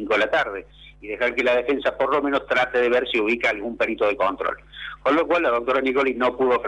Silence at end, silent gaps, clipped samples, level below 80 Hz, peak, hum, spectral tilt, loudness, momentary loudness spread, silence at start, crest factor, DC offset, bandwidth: 0 s; none; under 0.1%; -52 dBFS; -8 dBFS; none; -4.5 dB/octave; -21 LUFS; 9 LU; 0 s; 14 dB; under 0.1%; 11 kHz